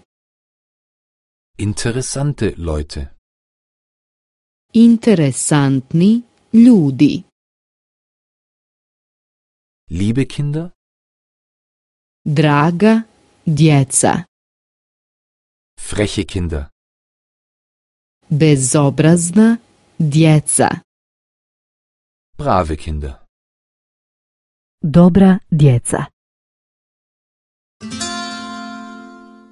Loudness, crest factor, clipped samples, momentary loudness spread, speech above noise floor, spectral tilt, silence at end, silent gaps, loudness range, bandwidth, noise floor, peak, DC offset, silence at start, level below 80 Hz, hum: -14 LUFS; 16 dB; under 0.1%; 17 LU; 26 dB; -6 dB/octave; 0.45 s; 3.18-4.69 s, 7.32-9.87 s, 10.75-12.25 s, 14.28-15.77 s, 16.72-18.21 s, 20.84-22.33 s, 23.29-24.78 s, 26.13-27.80 s; 11 LU; 11.5 kHz; -39 dBFS; 0 dBFS; under 0.1%; 1.6 s; -36 dBFS; none